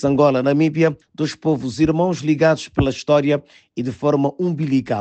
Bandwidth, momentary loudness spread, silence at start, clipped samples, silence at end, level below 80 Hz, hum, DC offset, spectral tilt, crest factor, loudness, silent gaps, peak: 8.6 kHz; 8 LU; 0 s; under 0.1%; 0 s; -44 dBFS; none; under 0.1%; -7 dB/octave; 14 dB; -19 LUFS; none; -4 dBFS